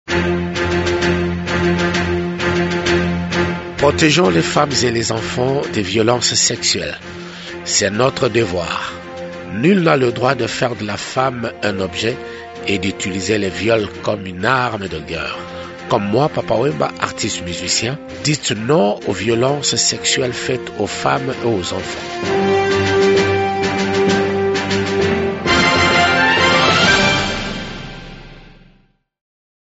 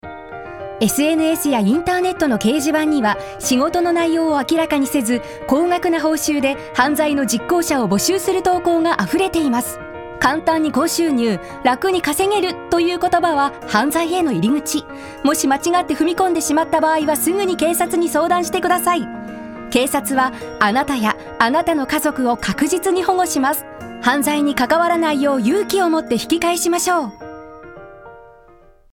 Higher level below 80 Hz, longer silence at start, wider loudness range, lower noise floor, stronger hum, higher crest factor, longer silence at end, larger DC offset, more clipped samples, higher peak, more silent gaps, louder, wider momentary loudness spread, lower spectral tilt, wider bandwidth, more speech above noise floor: first, -40 dBFS vs -48 dBFS; about the same, 0.05 s vs 0.05 s; first, 5 LU vs 1 LU; first, -55 dBFS vs -47 dBFS; neither; about the same, 18 dB vs 16 dB; first, 1.25 s vs 0.65 s; neither; neither; about the same, 0 dBFS vs -2 dBFS; neither; about the same, -16 LUFS vs -17 LUFS; first, 12 LU vs 5 LU; about the same, -4 dB/octave vs -3.5 dB/octave; second, 8.2 kHz vs 19.5 kHz; first, 38 dB vs 30 dB